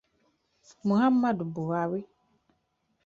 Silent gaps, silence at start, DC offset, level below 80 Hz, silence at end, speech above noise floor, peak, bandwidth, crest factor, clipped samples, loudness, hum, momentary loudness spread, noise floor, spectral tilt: none; 0.85 s; under 0.1%; -70 dBFS; 1 s; 48 dB; -14 dBFS; 7.4 kHz; 16 dB; under 0.1%; -28 LUFS; none; 10 LU; -75 dBFS; -8 dB/octave